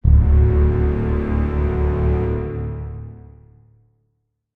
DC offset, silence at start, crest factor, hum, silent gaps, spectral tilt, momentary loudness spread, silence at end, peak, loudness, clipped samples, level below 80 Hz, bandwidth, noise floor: under 0.1%; 0.05 s; 16 dB; none; none; -11.5 dB/octave; 16 LU; 1.35 s; -2 dBFS; -19 LUFS; under 0.1%; -20 dBFS; 3.1 kHz; -71 dBFS